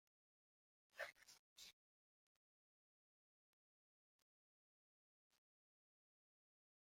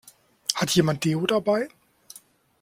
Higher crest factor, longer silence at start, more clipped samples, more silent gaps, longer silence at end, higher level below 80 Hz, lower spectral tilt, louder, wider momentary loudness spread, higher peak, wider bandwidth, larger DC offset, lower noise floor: first, 32 dB vs 24 dB; first, 0.95 s vs 0.5 s; neither; first, 1.39-1.56 s vs none; first, 5.15 s vs 0.95 s; second, under -90 dBFS vs -60 dBFS; second, 0.5 dB/octave vs -4.5 dB/octave; second, -59 LUFS vs -24 LUFS; first, 12 LU vs 8 LU; second, -38 dBFS vs -2 dBFS; about the same, 15.5 kHz vs 16.5 kHz; neither; first, under -90 dBFS vs -53 dBFS